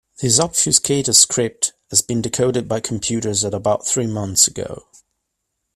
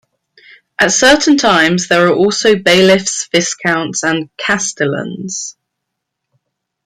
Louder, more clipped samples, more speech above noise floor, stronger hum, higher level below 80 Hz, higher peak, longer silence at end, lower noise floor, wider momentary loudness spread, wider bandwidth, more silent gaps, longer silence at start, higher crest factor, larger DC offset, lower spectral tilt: second, -16 LUFS vs -12 LUFS; neither; second, 57 dB vs 63 dB; neither; about the same, -52 dBFS vs -48 dBFS; about the same, 0 dBFS vs 0 dBFS; second, 0.95 s vs 1.35 s; about the same, -76 dBFS vs -75 dBFS; second, 10 LU vs 13 LU; about the same, 15.5 kHz vs 15.5 kHz; neither; second, 0.2 s vs 0.8 s; first, 20 dB vs 14 dB; neither; about the same, -3 dB/octave vs -3 dB/octave